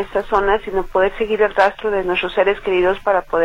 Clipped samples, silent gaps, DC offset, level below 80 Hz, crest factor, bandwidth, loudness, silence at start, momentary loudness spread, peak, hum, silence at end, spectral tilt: under 0.1%; none; under 0.1%; -36 dBFS; 16 dB; 10.5 kHz; -17 LUFS; 0 s; 3 LU; -2 dBFS; none; 0 s; -5.5 dB/octave